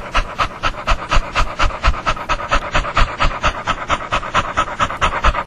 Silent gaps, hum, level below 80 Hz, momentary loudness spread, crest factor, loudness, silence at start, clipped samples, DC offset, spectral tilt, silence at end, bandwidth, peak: none; none; -22 dBFS; 4 LU; 18 dB; -19 LUFS; 0 s; under 0.1%; under 0.1%; -3.5 dB/octave; 0 s; 10 kHz; 0 dBFS